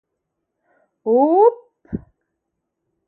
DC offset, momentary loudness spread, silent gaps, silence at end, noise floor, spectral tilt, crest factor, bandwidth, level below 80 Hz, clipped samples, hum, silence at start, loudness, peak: under 0.1%; 19 LU; none; 1.1 s; -77 dBFS; -12.5 dB/octave; 18 dB; 2.8 kHz; -54 dBFS; under 0.1%; none; 1.05 s; -15 LUFS; -2 dBFS